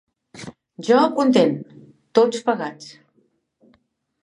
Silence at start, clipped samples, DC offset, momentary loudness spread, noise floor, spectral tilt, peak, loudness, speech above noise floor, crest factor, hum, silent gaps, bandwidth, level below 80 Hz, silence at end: 0.35 s; under 0.1%; under 0.1%; 22 LU; -65 dBFS; -5.5 dB/octave; -2 dBFS; -19 LUFS; 47 dB; 20 dB; none; none; 11 kHz; -70 dBFS; 1.3 s